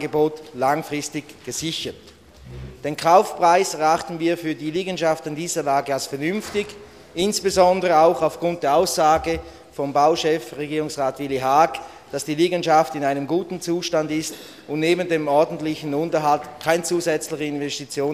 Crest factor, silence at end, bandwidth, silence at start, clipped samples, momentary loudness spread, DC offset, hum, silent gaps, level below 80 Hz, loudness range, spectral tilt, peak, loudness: 20 dB; 0 s; 15 kHz; 0 s; under 0.1%; 12 LU; under 0.1%; none; none; -52 dBFS; 3 LU; -4 dB/octave; -2 dBFS; -21 LUFS